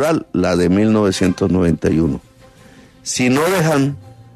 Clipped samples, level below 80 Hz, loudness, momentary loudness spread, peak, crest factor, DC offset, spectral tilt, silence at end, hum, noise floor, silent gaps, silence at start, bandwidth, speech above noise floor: under 0.1%; -40 dBFS; -16 LUFS; 8 LU; -4 dBFS; 12 dB; under 0.1%; -5.5 dB/octave; 0.15 s; none; -44 dBFS; none; 0 s; 13.5 kHz; 29 dB